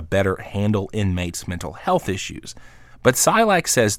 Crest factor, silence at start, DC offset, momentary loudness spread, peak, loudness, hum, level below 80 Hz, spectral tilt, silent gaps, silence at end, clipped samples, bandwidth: 20 dB; 0 s; under 0.1%; 14 LU; -2 dBFS; -20 LUFS; none; -44 dBFS; -4 dB/octave; none; 0 s; under 0.1%; 17 kHz